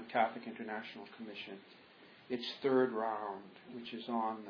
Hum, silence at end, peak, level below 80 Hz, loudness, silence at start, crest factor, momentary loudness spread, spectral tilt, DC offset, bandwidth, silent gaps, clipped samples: none; 0 s; -20 dBFS; -88 dBFS; -38 LUFS; 0 s; 20 dB; 21 LU; -2.5 dB/octave; under 0.1%; 5.4 kHz; none; under 0.1%